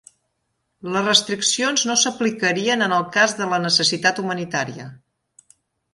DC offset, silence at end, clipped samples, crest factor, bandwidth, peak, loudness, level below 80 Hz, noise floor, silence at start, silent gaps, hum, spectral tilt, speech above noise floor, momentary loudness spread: under 0.1%; 0.95 s; under 0.1%; 22 dB; 11.5 kHz; 0 dBFS; -19 LUFS; -66 dBFS; -73 dBFS; 0.85 s; none; none; -2 dB/octave; 53 dB; 9 LU